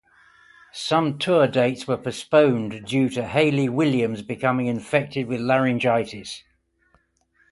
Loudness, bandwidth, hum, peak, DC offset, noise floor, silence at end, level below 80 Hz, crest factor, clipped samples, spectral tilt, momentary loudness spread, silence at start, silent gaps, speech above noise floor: -22 LUFS; 11.5 kHz; none; -4 dBFS; under 0.1%; -64 dBFS; 1.1 s; -60 dBFS; 18 dB; under 0.1%; -6 dB/octave; 9 LU; 0.75 s; none; 43 dB